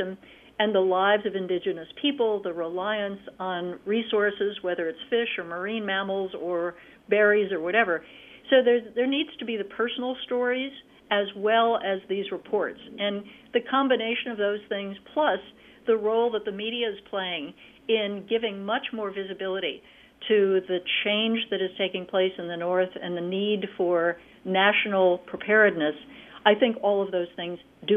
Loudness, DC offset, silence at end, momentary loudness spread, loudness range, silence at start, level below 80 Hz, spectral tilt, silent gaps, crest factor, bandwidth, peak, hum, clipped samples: -26 LUFS; under 0.1%; 0 s; 11 LU; 4 LU; 0 s; -68 dBFS; -7 dB/octave; none; 22 dB; 3.9 kHz; -4 dBFS; none; under 0.1%